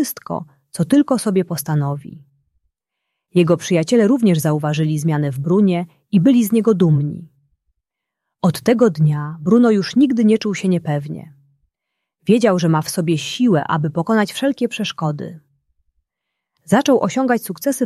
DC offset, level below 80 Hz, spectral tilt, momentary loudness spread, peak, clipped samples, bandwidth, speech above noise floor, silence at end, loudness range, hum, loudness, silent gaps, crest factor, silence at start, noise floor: under 0.1%; -60 dBFS; -6.5 dB/octave; 10 LU; -2 dBFS; under 0.1%; 14.5 kHz; 64 dB; 0 s; 4 LU; none; -17 LUFS; none; 16 dB; 0 s; -80 dBFS